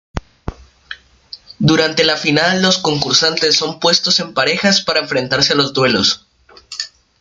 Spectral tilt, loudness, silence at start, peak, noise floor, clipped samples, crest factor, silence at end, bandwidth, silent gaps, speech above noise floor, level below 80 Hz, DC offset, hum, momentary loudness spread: -3 dB/octave; -13 LUFS; 0.15 s; 0 dBFS; -39 dBFS; under 0.1%; 16 dB; 0.35 s; 12 kHz; none; 25 dB; -42 dBFS; under 0.1%; none; 20 LU